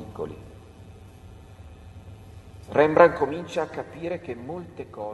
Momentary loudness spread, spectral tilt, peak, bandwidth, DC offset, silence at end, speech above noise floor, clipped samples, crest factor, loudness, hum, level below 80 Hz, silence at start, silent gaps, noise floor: 28 LU; -7 dB/octave; 0 dBFS; 12 kHz; under 0.1%; 0 s; 22 dB; under 0.1%; 26 dB; -24 LUFS; none; -52 dBFS; 0 s; none; -46 dBFS